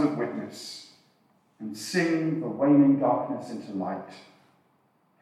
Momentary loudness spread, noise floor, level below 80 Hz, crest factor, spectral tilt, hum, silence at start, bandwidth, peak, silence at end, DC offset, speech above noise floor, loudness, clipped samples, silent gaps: 20 LU; -67 dBFS; -86 dBFS; 18 dB; -6 dB/octave; none; 0 s; 13.5 kHz; -10 dBFS; 1 s; under 0.1%; 42 dB; -26 LUFS; under 0.1%; none